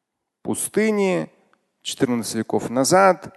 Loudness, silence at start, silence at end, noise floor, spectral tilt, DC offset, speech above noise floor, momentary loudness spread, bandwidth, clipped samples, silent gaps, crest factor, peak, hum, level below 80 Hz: -21 LUFS; 0.45 s; 0.05 s; -61 dBFS; -4 dB/octave; under 0.1%; 42 dB; 16 LU; 12.5 kHz; under 0.1%; none; 18 dB; -2 dBFS; none; -62 dBFS